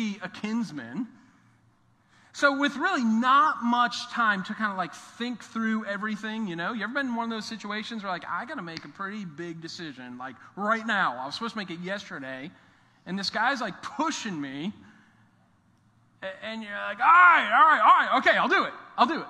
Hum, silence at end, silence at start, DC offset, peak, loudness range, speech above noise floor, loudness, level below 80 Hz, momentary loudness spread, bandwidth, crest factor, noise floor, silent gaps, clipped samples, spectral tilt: none; 0 s; 0 s; under 0.1%; -6 dBFS; 12 LU; 37 dB; -25 LUFS; -76 dBFS; 19 LU; 10.5 kHz; 20 dB; -63 dBFS; none; under 0.1%; -4 dB/octave